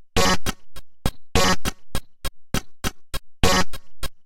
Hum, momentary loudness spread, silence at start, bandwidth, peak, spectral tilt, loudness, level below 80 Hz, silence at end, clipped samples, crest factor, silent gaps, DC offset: none; 16 LU; 0 s; 17 kHz; -2 dBFS; -3.5 dB/octave; -24 LUFS; -32 dBFS; 0.05 s; under 0.1%; 20 dB; none; under 0.1%